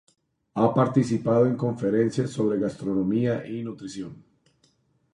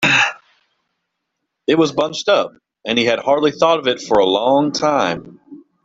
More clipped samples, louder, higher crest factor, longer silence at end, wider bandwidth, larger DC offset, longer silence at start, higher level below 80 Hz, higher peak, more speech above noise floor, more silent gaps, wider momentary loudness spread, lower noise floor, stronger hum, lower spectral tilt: neither; second, -25 LUFS vs -16 LUFS; about the same, 18 dB vs 18 dB; first, 0.95 s vs 0.3 s; first, 11 kHz vs 8.2 kHz; neither; first, 0.55 s vs 0 s; about the same, -62 dBFS vs -58 dBFS; second, -8 dBFS vs 0 dBFS; second, 42 dB vs 60 dB; neither; first, 14 LU vs 7 LU; second, -66 dBFS vs -76 dBFS; neither; first, -8 dB/octave vs -4 dB/octave